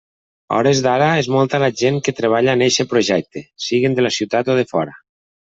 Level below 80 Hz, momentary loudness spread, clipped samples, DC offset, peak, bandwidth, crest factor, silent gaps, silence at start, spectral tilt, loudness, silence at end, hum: -58 dBFS; 7 LU; under 0.1%; under 0.1%; -2 dBFS; 8 kHz; 14 dB; none; 0.5 s; -4.5 dB/octave; -17 LUFS; 0.65 s; none